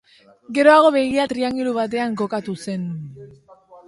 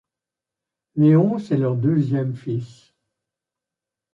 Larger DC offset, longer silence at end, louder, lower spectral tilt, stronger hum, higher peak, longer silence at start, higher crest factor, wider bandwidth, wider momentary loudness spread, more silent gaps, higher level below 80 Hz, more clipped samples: neither; second, 0.15 s vs 1.45 s; about the same, -19 LUFS vs -20 LUFS; second, -5.5 dB/octave vs -10.5 dB/octave; neither; first, -2 dBFS vs -6 dBFS; second, 0.5 s vs 0.95 s; about the same, 18 dB vs 18 dB; first, 11.5 kHz vs 7.4 kHz; about the same, 15 LU vs 14 LU; neither; about the same, -60 dBFS vs -64 dBFS; neither